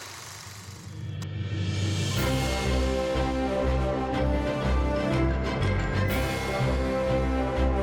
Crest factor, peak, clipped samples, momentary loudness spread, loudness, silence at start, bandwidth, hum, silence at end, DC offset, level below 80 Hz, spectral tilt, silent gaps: 12 dB; -16 dBFS; under 0.1%; 12 LU; -27 LUFS; 0 s; 18 kHz; none; 0 s; under 0.1%; -32 dBFS; -6 dB/octave; none